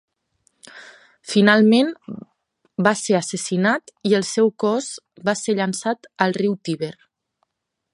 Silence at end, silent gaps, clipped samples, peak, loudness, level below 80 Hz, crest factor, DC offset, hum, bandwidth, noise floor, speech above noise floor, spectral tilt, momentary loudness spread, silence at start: 1 s; none; under 0.1%; 0 dBFS; -20 LUFS; -70 dBFS; 20 dB; under 0.1%; none; 11.5 kHz; -76 dBFS; 56 dB; -4.5 dB/octave; 18 LU; 0.65 s